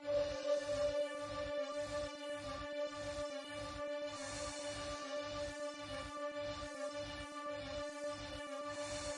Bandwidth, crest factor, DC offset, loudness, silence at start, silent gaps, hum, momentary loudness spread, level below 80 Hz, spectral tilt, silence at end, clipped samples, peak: 11.5 kHz; 16 dB; under 0.1%; -43 LUFS; 0 s; none; none; 7 LU; -62 dBFS; -3.5 dB/octave; 0 s; under 0.1%; -26 dBFS